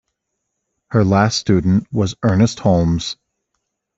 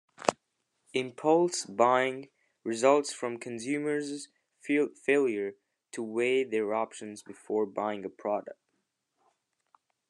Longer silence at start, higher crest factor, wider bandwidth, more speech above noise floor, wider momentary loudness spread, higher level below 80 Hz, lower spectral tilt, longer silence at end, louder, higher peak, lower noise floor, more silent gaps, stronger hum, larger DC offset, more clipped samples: first, 0.9 s vs 0.2 s; second, 16 dB vs 26 dB; second, 8 kHz vs 11.5 kHz; first, 60 dB vs 50 dB; second, 7 LU vs 17 LU; first, -42 dBFS vs -84 dBFS; first, -6 dB/octave vs -4 dB/octave; second, 0.85 s vs 1.55 s; first, -16 LUFS vs -30 LUFS; about the same, -2 dBFS vs -4 dBFS; second, -76 dBFS vs -80 dBFS; neither; neither; neither; neither